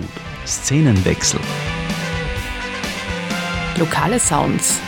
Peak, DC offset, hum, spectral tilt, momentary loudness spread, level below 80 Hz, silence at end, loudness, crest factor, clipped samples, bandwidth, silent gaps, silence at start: -4 dBFS; under 0.1%; none; -4 dB/octave; 9 LU; -34 dBFS; 0 s; -19 LUFS; 14 dB; under 0.1%; 17.5 kHz; none; 0 s